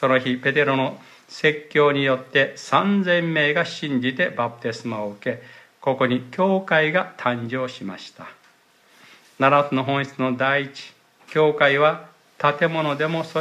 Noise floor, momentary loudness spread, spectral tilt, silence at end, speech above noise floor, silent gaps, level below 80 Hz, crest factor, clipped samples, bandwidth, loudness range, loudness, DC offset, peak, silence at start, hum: -57 dBFS; 11 LU; -6 dB/octave; 0 s; 36 dB; none; -70 dBFS; 18 dB; under 0.1%; 12.5 kHz; 4 LU; -21 LUFS; under 0.1%; -4 dBFS; 0 s; none